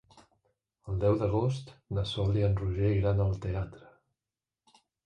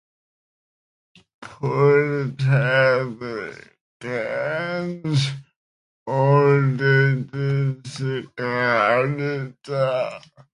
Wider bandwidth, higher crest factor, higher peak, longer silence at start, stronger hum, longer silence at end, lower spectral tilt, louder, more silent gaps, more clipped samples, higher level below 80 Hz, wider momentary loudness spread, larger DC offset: second, 9 kHz vs 10.5 kHz; about the same, 16 dB vs 18 dB; second, -16 dBFS vs -4 dBFS; second, 0.85 s vs 1.4 s; neither; first, 1.3 s vs 0.35 s; about the same, -8 dB/octave vs -7 dB/octave; second, -30 LUFS vs -21 LUFS; second, none vs 3.81-4.00 s, 5.56-6.06 s; neither; first, -44 dBFS vs -62 dBFS; second, 10 LU vs 13 LU; neither